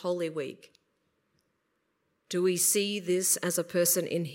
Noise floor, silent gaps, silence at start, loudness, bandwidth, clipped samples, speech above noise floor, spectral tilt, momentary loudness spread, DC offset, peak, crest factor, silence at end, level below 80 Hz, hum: -77 dBFS; none; 0 s; -27 LUFS; 16.5 kHz; under 0.1%; 48 dB; -3 dB/octave; 10 LU; under 0.1%; -12 dBFS; 20 dB; 0 s; -82 dBFS; none